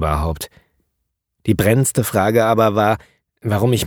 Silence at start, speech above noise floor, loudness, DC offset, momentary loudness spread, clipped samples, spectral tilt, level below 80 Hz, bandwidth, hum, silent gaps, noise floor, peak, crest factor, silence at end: 0 s; 58 dB; -17 LUFS; under 0.1%; 13 LU; under 0.1%; -5.5 dB/octave; -34 dBFS; 20 kHz; none; none; -74 dBFS; 0 dBFS; 18 dB; 0 s